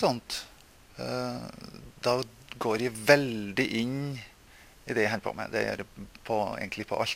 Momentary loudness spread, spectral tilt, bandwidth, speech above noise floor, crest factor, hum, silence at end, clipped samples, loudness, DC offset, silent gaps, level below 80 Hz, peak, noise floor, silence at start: 21 LU; -4.5 dB/octave; 16 kHz; 25 dB; 26 dB; none; 0 s; under 0.1%; -30 LUFS; under 0.1%; none; -58 dBFS; -4 dBFS; -55 dBFS; 0 s